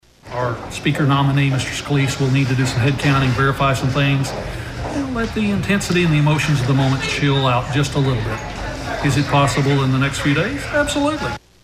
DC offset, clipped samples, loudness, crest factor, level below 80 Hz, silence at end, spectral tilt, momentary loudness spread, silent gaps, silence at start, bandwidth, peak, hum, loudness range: under 0.1%; under 0.1%; -18 LUFS; 16 dB; -36 dBFS; 0.25 s; -5.5 dB/octave; 9 LU; none; 0.25 s; 15 kHz; -2 dBFS; none; 1 LU